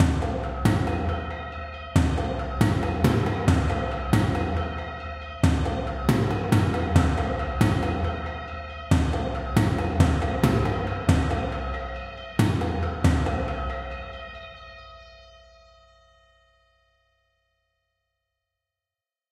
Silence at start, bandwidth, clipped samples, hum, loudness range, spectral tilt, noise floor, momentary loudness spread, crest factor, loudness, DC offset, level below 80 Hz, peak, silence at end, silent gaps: 0 s; 15.5 kHz; under 0.1%; none; 6 LU; -7 dB/octave; under -90 dBFS; 13 LU; 20 dB; -25 LUFS; under 0.1%; -34 dBFS; -4 dBFS; 4.1 s; none